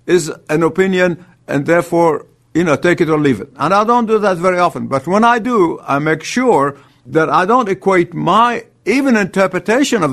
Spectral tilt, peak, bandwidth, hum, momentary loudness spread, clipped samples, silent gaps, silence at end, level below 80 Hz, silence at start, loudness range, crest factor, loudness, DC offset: -5.5 dB/octave; 0 dBFS; 13.5 kHz; none; 6 LU; under 0.1%; none; 0 s; -52 dBFS; 0.05 s; 1 LU; 14 dB; -14 LUFS; under 0.1%